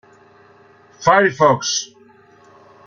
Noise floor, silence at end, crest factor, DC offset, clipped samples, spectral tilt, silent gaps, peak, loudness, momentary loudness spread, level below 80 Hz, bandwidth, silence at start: -49 dBFS; 1 s; 18 dB; under 0.1%; under 0.1%; -3.5 dB/octave; none; -2 dBFS; -16 LUFS; 9 LU; -58 dBFS; 7.4 kHz; 1 s